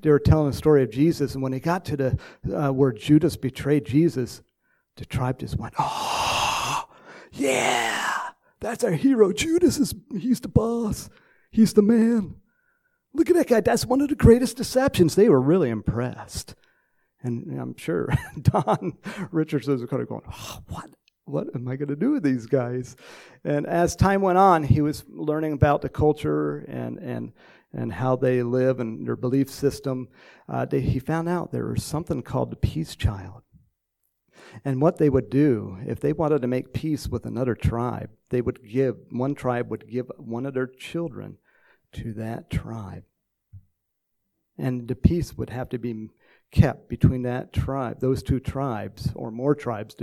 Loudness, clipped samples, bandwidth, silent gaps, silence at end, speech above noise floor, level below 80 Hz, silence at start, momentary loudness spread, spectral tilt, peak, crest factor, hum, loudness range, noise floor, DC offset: -24 LUFS; under 0.1%; 16 kHz; none; 0 s; 55 dB; -42 dBFS; 0.05 s; 15 LU; -6.5 dB/octave; -4 dBFS; 20 dB; none; 9 LU; -78 dBFS; under 0.1%